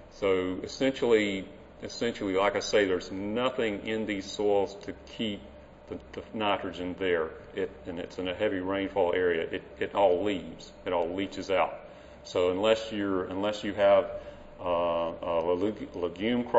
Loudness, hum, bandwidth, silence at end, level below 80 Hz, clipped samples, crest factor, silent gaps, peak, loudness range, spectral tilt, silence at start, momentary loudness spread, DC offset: -29 LUFS; none; 8 kHz; 0 s; -56 dBFS; under 0.1%; 20 dB; none; -10 dBFS; 4 LU; -5 dB/octave; 0 s; 15 LU; under 0.1%